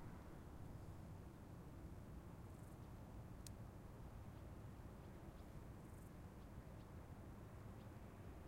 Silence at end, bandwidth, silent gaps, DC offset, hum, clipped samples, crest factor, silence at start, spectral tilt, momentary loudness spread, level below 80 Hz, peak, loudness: 0 s; 16 kHz; none; under 0.1%; none; under 0.1%; 20 dB; 0 s; -6.5 dB/octave; 2 LU; -62 dBFS; -38 dBFS; -58 LUFS